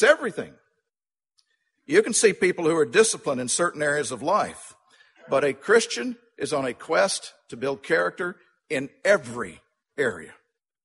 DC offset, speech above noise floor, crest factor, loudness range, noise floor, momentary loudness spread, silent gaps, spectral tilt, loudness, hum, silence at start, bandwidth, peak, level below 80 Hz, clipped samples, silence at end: under 0.1%; over 67 dB; 22 dB; 5 LU; under -90 dBFS; 14 LU; none; -3 dB/octave; -24 LUFS; none; 0 s; 11.5 kHz; -4 dBFS; -68 dBFS; under 0.1%; 0.55 s